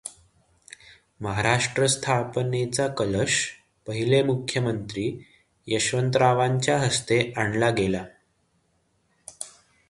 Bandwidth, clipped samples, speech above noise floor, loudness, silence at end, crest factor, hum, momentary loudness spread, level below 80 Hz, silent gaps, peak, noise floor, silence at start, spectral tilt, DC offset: 11.5 kHz; under 0.1%; 45 dB; -24 LUFS; 0.4 s; 22 dB; none; 16 LU; -54 dBFS; none; -4 dBFS; -69 dBFS; 0.05 s; -4.5 dB/octave; under 0.1%